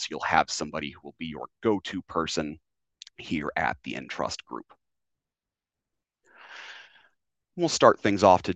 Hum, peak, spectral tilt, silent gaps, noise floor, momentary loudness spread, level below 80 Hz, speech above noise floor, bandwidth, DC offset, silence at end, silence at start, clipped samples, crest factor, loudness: none; -2 dBFS; -4 dB/octave; none; under -90 dBFS; 23 LU; -62 dBFS; over 64 dB; 9 kHz; under 0.1%; 0 s; 0 s; under 0.1%; 26 dB; -27 LUFS